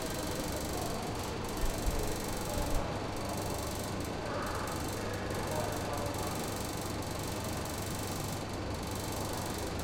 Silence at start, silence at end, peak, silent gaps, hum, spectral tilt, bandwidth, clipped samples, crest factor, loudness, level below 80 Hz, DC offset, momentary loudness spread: 0 s; 0 s; -18 dBFS; none; none; -4.5 dB/octave; 17 kHz; under 0.1%; 18 dB; -36 LUFS; -44 dBFS; under 0.1%; 2 LU